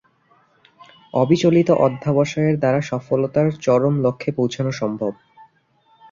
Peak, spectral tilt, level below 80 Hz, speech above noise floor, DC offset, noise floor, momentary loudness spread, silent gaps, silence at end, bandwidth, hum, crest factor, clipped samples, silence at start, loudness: -2 dBFS; -7.5 dB/octave; -58 dBFS; 41 dB; under 0.1%; -59 dBFS; 8 LU; none; 0.7 s; 7.6 kHz; none; 18 dB; under 0.1%; 1.15 s; -19 LUFS